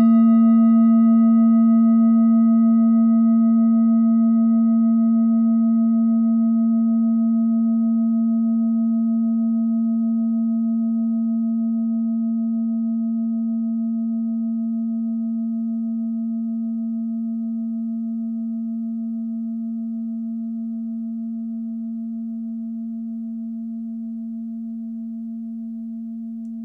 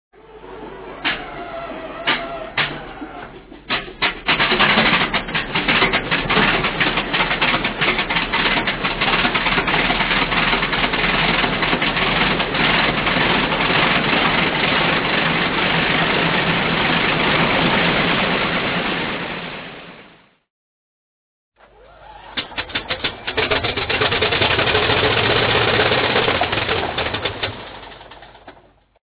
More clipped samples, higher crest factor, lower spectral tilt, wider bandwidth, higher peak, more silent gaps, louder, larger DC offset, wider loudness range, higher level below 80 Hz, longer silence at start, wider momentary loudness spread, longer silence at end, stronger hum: neither; second, 10 dB vs 18 dB; first, -12.5 dB/octave vs -8 dB/octave; second, 2.1 kHz vs 4 kHz; second, -8 dBFS vs -2 dBFS; second, none vs 20.50-21.52 s; second, -20 LUFS vs -17 LUFS; neither; first, 13 LU vs 9 LU; second, -68 dBFS vs -38 dBFS; second, 0 s vs 0.3 s; first, 15 LU vs 12 LU; second, 0 s vs 0.55 s; neither